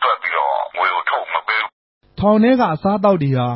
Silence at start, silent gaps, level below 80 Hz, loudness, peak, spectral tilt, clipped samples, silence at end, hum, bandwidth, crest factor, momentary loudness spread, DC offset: 0 s; 1.72-2.01 s; -48 dBFS; -17 LUFS; -2 dBFS; -11.5 dB/octave; under 0.1%; 0 s; none; 5.8 kHz; 14 dB; 6 LU; under 0.1%